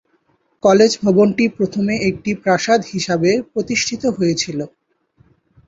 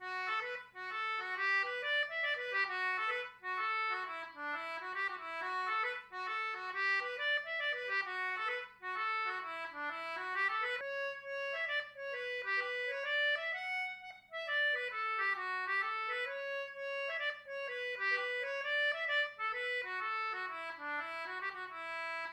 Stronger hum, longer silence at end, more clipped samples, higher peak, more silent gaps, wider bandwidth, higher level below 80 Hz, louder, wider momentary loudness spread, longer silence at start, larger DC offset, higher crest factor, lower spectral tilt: neither; first, 1 s vs 0 s; neither; first, 0 dBFS vs -24 dBFS; neither; second, 8 kHz vs 14.5 kHz; first, -54 dBFS vs -84 dBFS; first, -17 LUFS vs -36 LUFS; about the same, 8 LU vs 8 LU; first, 0.65 s vs 0 s; neither; about the same, 16 dB vs 16 dB; first, -5 dB/octave vs -1 dB/octave